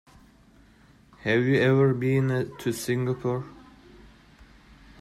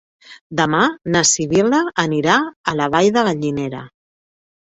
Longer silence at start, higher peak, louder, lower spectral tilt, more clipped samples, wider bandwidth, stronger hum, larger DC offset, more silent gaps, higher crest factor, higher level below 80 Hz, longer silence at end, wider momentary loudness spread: first, 1.25 s vs 0.3 s; second, -12 dBFS vs -2 dBFS; second, -25 LUFS vs -17 LUFS; first, -6.5 dB/octave vs -3.5 dB/octave; neither; first, 15 kHz vs 8.4 kHz; neither; neither; second, none vs 0.41-0.50 s, 2.56-2.64 s; about the same, 16 dB vs 16 dB; about the same, -58 dBFS vs -54 dBFS; first, 1.45 s vs 0.8 s; about the same, 11 LU vs 9 LU